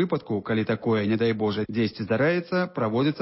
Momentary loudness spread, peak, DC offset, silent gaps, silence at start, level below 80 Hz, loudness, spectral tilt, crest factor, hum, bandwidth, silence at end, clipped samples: 4 LU; -12 dBFS; under 0.1%; none; 0 s; -58 dBFS; -25 LUFS; -11 dB/octave; 14 dB; none; 5.8 kHz; 0 s; under 0.1%